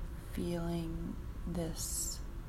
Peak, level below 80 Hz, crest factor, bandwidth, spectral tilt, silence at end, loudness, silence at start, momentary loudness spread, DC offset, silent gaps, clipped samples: -24 dBFS; -44 dBFS; 14 dB; 16 kHz; -4.5 dB/octave; 0 s; -39 LUFS; 0 s; 7 LU; under 0.1%; none; under 0.1%